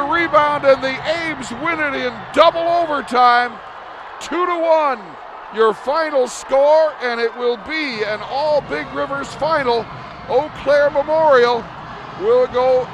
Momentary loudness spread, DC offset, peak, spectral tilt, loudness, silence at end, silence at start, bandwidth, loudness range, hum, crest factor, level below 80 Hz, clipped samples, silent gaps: 15 LU; under 0.1%; 0 dBFS; -4 dB/octave; -17 LUFS; 0 s; 0 s; 11 kHz; 3 LU; none; 18 dB; -50 dBFS; under 0.1%; none